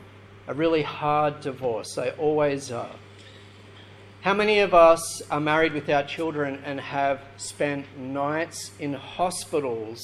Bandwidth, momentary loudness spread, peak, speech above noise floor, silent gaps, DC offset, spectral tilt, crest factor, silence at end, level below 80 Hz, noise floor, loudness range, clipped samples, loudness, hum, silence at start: 13.5 kHz; 14 LU; -4 dBFS; 23 dB; none; under 0.1%; -4.5 dB/octave; 20 dB; 0 s; -54 dBFS; -47 dBFS; 7 LU; under 0.1%; -25 LUFS; none; 0 s